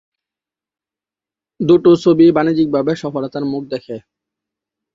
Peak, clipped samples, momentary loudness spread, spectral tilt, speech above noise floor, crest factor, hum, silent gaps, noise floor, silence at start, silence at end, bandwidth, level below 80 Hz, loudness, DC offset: -2 dBFS; under 0.1%; 15 LU; -8 dB/octave; 75 dB; 16 dB; none; none; -89 dBFS; 1.6 s; 0.95 s; 7.4 kHz; -56 dBFS; -14 LUFS; under 0.1%